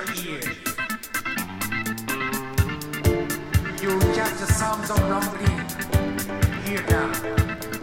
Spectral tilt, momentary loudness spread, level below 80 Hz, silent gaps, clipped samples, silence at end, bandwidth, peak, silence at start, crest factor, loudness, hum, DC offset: -5 dB/octave; 6 LU; -34 dBFS; none; under 0.1%; 0 s; 17 kHz; -6 dBFS; 0 s; 18 dB; -25 LUFS; none; under 0.1%